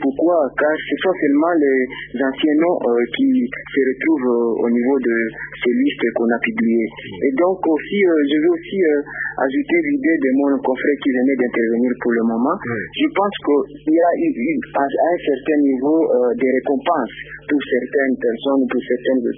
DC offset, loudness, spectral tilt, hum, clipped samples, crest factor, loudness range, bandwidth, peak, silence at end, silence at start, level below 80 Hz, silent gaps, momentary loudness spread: under 0.1%; -18 LUFS; -10.5 dB/octave; none; under 0.1%; 14 dB; 1 LU; 3.8 kHz; -4 dBFS; 0 s; 0 s; -54 dBFS; none; 5 LU